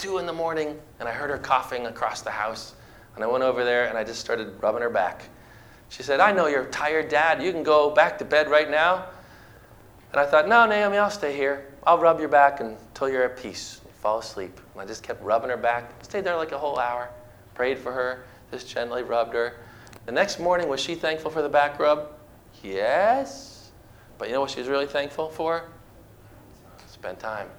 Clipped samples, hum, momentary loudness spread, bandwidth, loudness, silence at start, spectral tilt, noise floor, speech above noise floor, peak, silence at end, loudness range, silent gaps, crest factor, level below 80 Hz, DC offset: under 0.1%; none; 18 LU; over 20 kHz; -24 LUFS; 0 s; -4 dB/octave; -50 dBFS; 26 dB; -4 dBFS; 0.05 s; 8 LU; none; 22 dB; -56 dBFS; under 0.1%